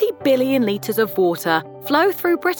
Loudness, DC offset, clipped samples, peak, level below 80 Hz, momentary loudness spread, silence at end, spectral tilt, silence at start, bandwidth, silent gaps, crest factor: -19 LUFS; under 0.1%; under 0.1%; -2 dBFS; -66 dBFS; 4 LU; 0 s; -5 dB/octave; 0 s; over 20 kHz; none; 16 dB